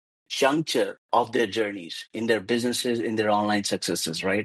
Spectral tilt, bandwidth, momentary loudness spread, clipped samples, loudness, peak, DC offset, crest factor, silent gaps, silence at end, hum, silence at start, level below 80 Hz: -3.5 dB/octave; 12.5 kHz; 7 LU; under 0.1%; -25 LUFS; -8 dBFS; under 0.1%; 18 dB; 0.98-1.09 s; 0 s; none; 0.3 s; -70 dBFS